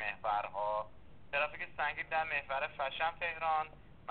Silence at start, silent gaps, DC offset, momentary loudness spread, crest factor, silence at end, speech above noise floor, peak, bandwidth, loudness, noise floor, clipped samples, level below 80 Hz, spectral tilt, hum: 0 s; none; 0.2%; 5 LU; 16 dB; 0 s; 21 dB; -22 dBFS; 4.6 kHz; -36 LUFS; -58 dBFS; under 0.1%; -62 dBFS; 0 dB/octave; none